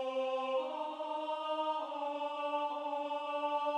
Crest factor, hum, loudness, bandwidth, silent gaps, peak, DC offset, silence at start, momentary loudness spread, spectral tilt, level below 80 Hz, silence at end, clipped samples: 12 dB; none; -37 LUFS; 10 kHz; none; -24 dBFS; under 0.1%; 0 s; 4 LU; -2 dB/octave; under -90 dBFS; 0 s; under 0.1%